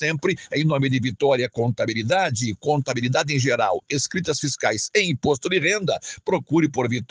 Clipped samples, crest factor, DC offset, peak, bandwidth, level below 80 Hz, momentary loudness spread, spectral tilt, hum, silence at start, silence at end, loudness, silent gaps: under 0.1%; 16 dB; under 0.1%; -6 dBFS; 10 kHz; -58 dBFS; 4 LU; -4.5 dB/octave; none; 0 s; 0.05 s; -22 LUFS; none